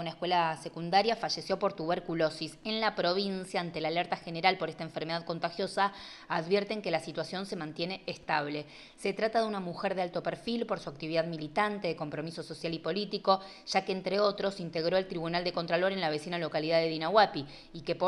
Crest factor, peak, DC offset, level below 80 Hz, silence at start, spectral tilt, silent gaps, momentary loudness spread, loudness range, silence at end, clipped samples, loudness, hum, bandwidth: 22 dB; -10 dBFS; under 0.1%; -64 dBFS; 0 s; -5 dB/octave; none; 8 LU; 4 LU; 0 s; under 0.1%; -32 LUFS; none; 12 kHz